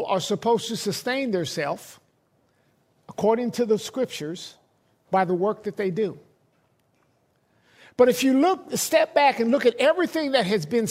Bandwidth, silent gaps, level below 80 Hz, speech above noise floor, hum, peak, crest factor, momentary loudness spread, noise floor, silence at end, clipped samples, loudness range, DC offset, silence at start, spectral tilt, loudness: 16 kHz; none; -70 dBFS; 44 dB; none; -4 dBFS; 20 dB; 10 LU; -66 dBFS; 0 s; under 0.1%; 8 LU; under 0.1%; 0 s; -4.5 dB/octave; -23 LUFS